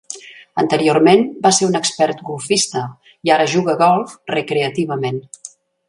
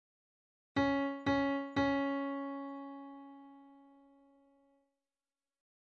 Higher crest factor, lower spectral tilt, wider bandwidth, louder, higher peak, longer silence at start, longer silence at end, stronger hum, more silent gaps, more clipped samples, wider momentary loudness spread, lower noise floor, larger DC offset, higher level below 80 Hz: about the same, 16 dB vs 18 dB; second, -4 dB/octave vs -6.5 dB/octave; first, 11.5 kHz vs 7 kHz; first, -16 LUFS vs -35 LUFS; first, 0 dBFS vs -20 dBFS; second, 0.1 s vs 0.75 s; second, 0.4 s vs 2.15 s; neither; neither; neither; second, 17 LU vs 20 LU; second, -36 dBFS vs under -90 dBFS; neither; about the same, -62 dBFS vs -66 dBFS